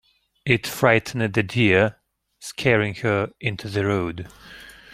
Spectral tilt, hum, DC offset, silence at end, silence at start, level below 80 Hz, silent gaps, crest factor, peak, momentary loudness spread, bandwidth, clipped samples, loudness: -5.5 dB/octave; none; under 0.1%; 0.2 s; 0.45 s; -54 dBFS; none; 22 dB; -2 dBFS; 20 LU; 16.5 kHz; under 0.1%; -21 LUFS